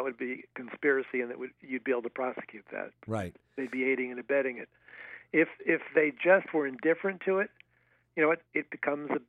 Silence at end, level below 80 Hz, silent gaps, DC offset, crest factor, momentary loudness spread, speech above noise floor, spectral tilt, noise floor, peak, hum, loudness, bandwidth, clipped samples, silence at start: 0.05 s; -74 dBFS; none; under 0.1%; 22 dB; 15 LU; 39 dB; -7.5 dB/octave; -70 dBFS; -10 dBFS; none; -31 LUFS; 9.8 kHz; under 0.1%; 0 s